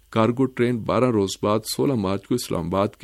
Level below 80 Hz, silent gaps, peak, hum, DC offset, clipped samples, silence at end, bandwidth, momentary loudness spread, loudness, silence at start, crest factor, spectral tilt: -52 dBFS; none; -4 dBFS; none; under 0.1%; under 0.1%; 0.1 s; 14.5 kHz; 4 LU; -23 LUFS; 0.1 s; 18 dB; -6 dB/octave